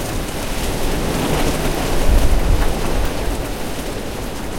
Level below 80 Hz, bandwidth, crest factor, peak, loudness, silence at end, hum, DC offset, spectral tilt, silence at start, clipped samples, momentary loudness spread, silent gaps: -20 dBFS; 17 kHz; 16 dB; -2 dBFS; -21 LUFS; 0 s; none; under 0.1%; -4.5 dB/octave; 0 s; under 0.1%; 7 LU; none